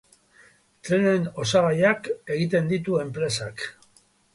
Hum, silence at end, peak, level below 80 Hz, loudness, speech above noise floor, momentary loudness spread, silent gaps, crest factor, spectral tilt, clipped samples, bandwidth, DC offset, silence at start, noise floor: none; 0.65 s; -6 dBFS; -60 dBFS; -24 LUFS; 37 dB; 12 LU; none; 18 dB; -5.5 dB/octave; under 0.1%; 11.5 kHz; under 0.1%; 0.85 s; -60 dBFS